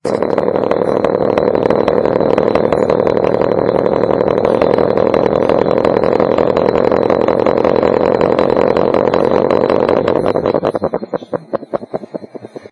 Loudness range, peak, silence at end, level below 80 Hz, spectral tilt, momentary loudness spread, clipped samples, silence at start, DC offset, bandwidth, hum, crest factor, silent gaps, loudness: 2 LU; 0 dBFS; 0.05 s; -42 dBFS; -8 dB/octave; 9 LU; under 0.1%; 0.05 s; under 0.1%; 10.5 kHz; none; 12 dB; none; -13 LUFS